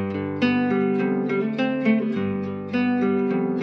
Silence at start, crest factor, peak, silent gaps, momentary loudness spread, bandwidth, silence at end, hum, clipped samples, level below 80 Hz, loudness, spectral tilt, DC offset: 0 s; 12 dB; -10 dBFS; none; 5 LU; 6.2 kHz; 0 s; none; under 0.1%; -72 dBFS; -23 LUFS; -8.5 dB/octave; under 0.1%